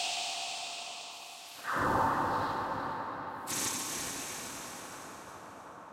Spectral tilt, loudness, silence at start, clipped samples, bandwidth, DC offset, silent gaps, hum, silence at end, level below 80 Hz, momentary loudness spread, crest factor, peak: -2 dB/octave; -35 LUFS; 0 s; under 0.1%; 16.5 kHz; under 0.1%; none; none; 0 s; -62 dBFS; 16 LU; 20 dB; -18 dBFS